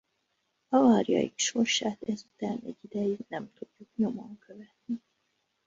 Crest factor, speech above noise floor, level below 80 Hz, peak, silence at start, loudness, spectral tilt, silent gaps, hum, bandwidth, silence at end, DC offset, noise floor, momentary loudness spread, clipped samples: 20 dB; 48 dB; -72 dBFS; -10 dBFS; 0.7 s; -29 LUFS; -4 dB/octave; none; none; 7.8 kHz; 0.7 s; under 0.1%; -78 dBFS; 21 LU; under 0.1%